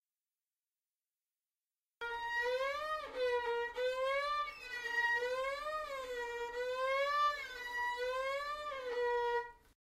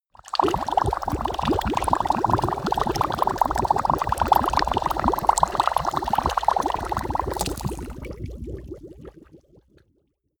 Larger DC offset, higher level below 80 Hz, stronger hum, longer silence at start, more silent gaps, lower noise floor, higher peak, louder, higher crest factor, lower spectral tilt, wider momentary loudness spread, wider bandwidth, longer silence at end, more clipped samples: neither; second, -68 dBFS vs -38 dBFS; neither; first, 2 s vs 0.25 s; neither; first, under -90 dBFS vs -69 dBFS; second, -24 dBFS vs 0 dBFS; second, -37 LUFS vs -23 LUFS; second, 14 dB vs 24 dB; second, -1 dB/octave vs -5 dB/octave; second, 8 LU vs 15 LU; second, 15 kHz vs over 20 kHz; second, 0.25 s vs 1.05 s; neither